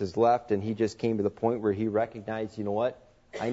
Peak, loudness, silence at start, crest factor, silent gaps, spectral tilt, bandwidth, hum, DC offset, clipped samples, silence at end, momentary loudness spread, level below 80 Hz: -12 dBFS; -29 LUFS; 0 s; 16 dB; none; -7.5 dB/octave; 8 kHz; none; under 0.1%; under 0.1%; 0 s; 10 LU; -62 dBFS